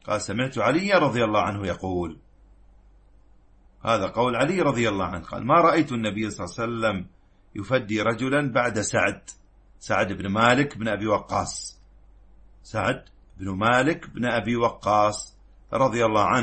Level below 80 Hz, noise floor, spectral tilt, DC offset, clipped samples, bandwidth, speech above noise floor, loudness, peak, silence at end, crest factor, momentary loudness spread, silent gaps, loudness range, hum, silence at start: -52 dBFS; -54 dBFS; -5 dB/octave; under 0.1%; under 0.1%; 8.8 kHz; 31 dB; -24 LUFS; -6 dBFS; 0 s; 20 dB; 13 LU; none; 4 LU; none; 0.05 s